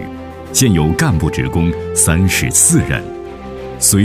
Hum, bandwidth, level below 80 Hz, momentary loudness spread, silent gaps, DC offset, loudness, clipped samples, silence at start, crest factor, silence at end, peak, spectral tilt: none; 16.5 kHz; -30 dBFS; 19 LU; none; under 0.1%; -13 LUFS; under 0.1%; 0 s; 14 dB; 0 s; 0 dBFS; -4 dB/octave